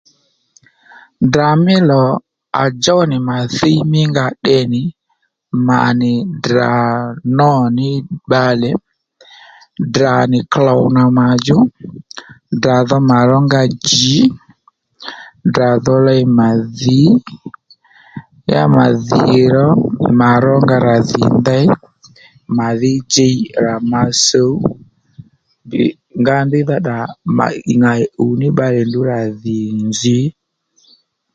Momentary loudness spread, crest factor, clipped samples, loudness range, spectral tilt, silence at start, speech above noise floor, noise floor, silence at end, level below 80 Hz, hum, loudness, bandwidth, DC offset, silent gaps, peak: 10 LU; 14 dB; under 0.1%; 4 LU; -5.5 dB/octave; 1.2 s; 53 dB; -65 dBFS; 1.05 s; -48 dBFS; none; -13 LUFS; 9 kHz; under 0.1%; none; 0 dBFS